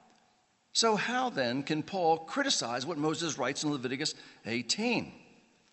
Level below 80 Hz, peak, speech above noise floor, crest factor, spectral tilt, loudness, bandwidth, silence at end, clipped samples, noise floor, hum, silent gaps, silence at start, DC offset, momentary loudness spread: -76 dBFS; -14 dBFS; 38 dB; 18 dB; -3 dB/octave; -31 LUFS; 8.6 kHz; 0.5 s; under 0.1%; -70 dBFS; none; none; 0.75 s; under 0.1%; 7 LU